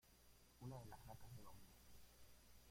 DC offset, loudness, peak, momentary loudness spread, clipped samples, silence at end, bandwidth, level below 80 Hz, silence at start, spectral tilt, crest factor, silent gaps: under 0.1%; -62 LUFS; -44 dBFS; 11 LU; under 0.1%; 0 s; 16.5 kHz; -72 dBFS; 0.05 s; -5 dB/octave; 18 dB; none